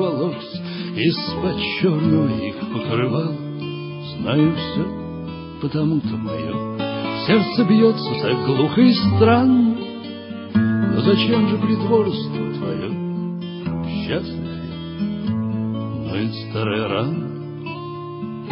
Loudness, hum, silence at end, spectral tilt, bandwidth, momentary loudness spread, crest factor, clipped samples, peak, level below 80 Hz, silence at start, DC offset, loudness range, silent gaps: -21 LUFS; none; 0 s; -11 dB/octave; 5.6 kHz; 15 LU; 18 dB; under 0.1%; -2 dBFS; -50 dBFS; 0 s; under 0.1%; 8 LU; none